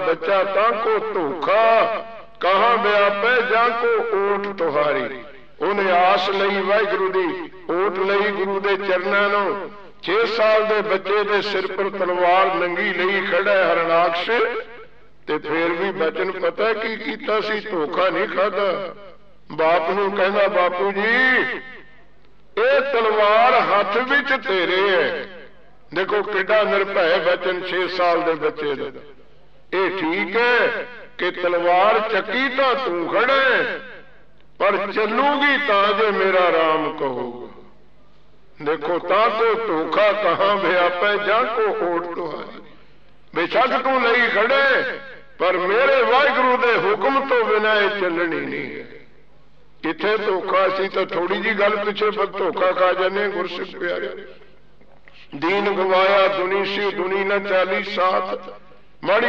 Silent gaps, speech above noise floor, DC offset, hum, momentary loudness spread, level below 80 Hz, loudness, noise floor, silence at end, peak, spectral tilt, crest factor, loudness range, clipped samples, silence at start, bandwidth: none; 35 dB; 0.8%; none; 11 LU; -60 dBFS; -19 LUFS; -55 dBFS; 0 s; -6 dBFS; -5.5 dB/octave; 14 dB; 4 LU; under 0.1%; 0 s; 7.2 kHz